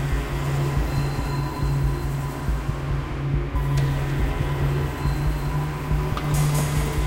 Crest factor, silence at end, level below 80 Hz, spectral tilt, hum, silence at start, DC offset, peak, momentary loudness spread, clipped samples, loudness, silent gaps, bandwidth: 12 dB; 0 s; -28 dBFS; -6.5 dB/octave; none; 0 s; under 0.1%; -10 dBFS; 4 LU; under 0.1%; -25 LUFS; none; 16 kHz